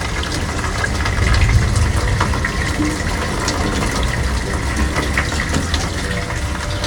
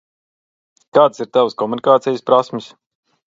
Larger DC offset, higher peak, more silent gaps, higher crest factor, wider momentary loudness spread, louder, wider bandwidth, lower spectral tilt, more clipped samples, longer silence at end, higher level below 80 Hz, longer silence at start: neither; about the same, -2 dBFS vs 0 dBFS; neither; about the same, 16 dB vs 18 dB; about the same, 5 LU vs 6 LU; second, -19 LUFS vs -16 LUFS; first, 18.5 kHz vs 7.6 kHz; second, -4.5 dB/octave vs -6 dB/octave; neither; second, 0 s vs 0.6 s; first, -22 dBFS vs -70 dBFS; second, 0 s vs 0.95 s